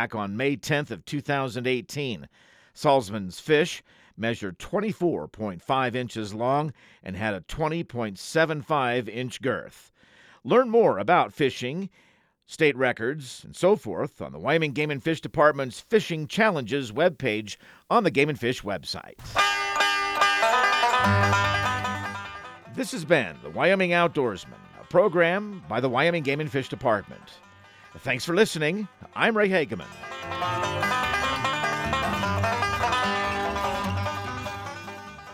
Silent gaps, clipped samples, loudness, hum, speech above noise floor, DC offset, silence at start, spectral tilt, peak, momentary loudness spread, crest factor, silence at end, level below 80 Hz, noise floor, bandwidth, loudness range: none; under 0.1%; -25 LUFS; none; 30 dB; under 0.1%; 0 s; -5 dB/octave; -6 dBFS; 13 LU; 20 dB; 0 s; -54 dBFS; -55 dBFS; 16 kHz; 5 LU